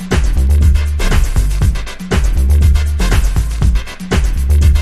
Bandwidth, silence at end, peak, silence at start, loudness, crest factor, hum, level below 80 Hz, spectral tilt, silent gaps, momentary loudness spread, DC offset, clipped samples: 14 kHz; 0 s; 0 dBFS; 0 s; -14 LUFS; 10 dB; none; -12 dBFS; -6 dB/octave; none; 6 LU; under 0.1%; under 0.1%